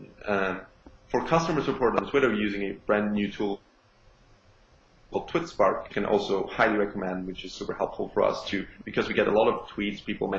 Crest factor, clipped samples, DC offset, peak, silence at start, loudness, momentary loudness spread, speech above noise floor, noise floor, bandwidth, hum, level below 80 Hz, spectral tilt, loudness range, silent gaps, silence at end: 22 dB; under 0.1%; under 0.1%; -6 dBFS; 0 s; -27 LUFS; 9 LU; 32 dB; -59 dBFS; 7.6 kHz; none; -52 dBFS; -6 dB/octave; 3 LU; none; 0 s